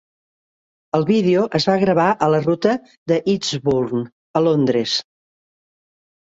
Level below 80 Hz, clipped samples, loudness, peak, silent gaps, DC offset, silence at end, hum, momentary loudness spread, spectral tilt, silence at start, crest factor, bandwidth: -56 dBFS; under 0.1%; -18 LUFS; -2 dBFS; 2.97-3.06 s, 4.12-4.34 s; under 0.1%; 1.3 s; none; 7 LU; -6 dB/octave; 0.95 s; 18 dB; 8 kHz